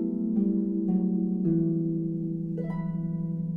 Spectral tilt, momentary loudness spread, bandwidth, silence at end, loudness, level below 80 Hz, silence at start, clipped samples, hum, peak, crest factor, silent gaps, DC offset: -13.5 dB/octave; 6 LU; 2.1 kHz; 0 s; -28 LUFS; -56 dBFS; 0 s; under 0.1%; none; -14 dBFS; 12 dB; none; under 0.1%